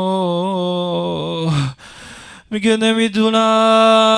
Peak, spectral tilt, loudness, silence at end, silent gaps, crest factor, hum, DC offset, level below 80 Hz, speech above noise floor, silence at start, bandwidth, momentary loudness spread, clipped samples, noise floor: -2 dBFS; -5.5 dB/octave; -16 LUFS; 0 s; none; 12 dB; none; under 0.1%; -52 dBFS; 25 dB; 0 s; 10.5 kHz; 19 LU; under 0.1%; -38 dBFS